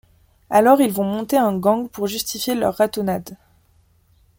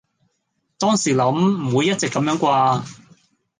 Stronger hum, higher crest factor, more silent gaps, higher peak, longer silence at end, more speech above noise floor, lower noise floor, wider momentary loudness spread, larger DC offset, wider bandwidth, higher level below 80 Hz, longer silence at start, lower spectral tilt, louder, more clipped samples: neither; about the same, 18 dB vs 16 dB; neither; about the same, -2 dBFS vs -4 dBFS; first, 1.05 s vs 0.65 s; second, 39 dB vs 54 dB; second, -58 dBFS vs -72 dBFS; first, 10 LU vs 5 LU; neither; first, 17 kHz vs 10 kHz; first, -56 dBFS vs -62 dBFS; second, 0.5 s vs 0.8 s; about the same, -5 dB/octave vs -5 dB/octave; about the same, -19 LUFS vs -19 LUFS; neither